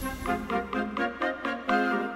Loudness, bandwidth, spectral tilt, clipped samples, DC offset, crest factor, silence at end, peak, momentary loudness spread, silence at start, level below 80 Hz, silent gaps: -29 LUFS; 16 kHz; -5 dB/octave; under 0.1%; under 0.1%; 16 dB; 0 s; -14 dBFS; 6 LU; 0 s; -48 dBFS; none